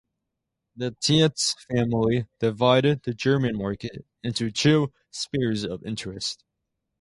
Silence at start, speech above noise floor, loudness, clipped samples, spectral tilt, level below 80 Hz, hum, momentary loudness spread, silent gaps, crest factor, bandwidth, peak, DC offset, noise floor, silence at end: 0.75 s; 58 dB; -24 LUFS; under 0.1%; -5 dB/octave; -54 dBFS; none; 13 LU; none; 20 dB; 11.5 kHz; -4 dBFS; under 0.1%; -82 dBFS; 0.65 s